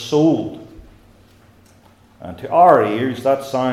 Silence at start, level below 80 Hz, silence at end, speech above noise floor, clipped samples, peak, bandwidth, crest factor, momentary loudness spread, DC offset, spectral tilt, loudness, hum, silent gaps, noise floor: 0 s; -54 dBFS; 0 s; 34 dB; under 0.1%; 0 dBFS; 14 kHz; 18 dB; 24 LU; under 0.1%; -6.5 dB/octave; -16 LUFS; none; none; -50 dBFS